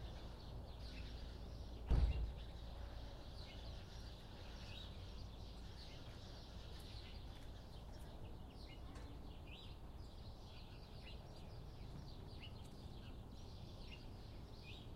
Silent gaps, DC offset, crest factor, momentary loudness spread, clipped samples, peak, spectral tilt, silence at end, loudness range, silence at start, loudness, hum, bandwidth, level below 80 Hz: none; under 0.1%; 24 dB; 4 LU; under 0.1%; -26 dBFS; -6 dB/octave; 0 s; 8 LU; 0 s; -53 LUFS; none; 15 kHz; -50 dBFS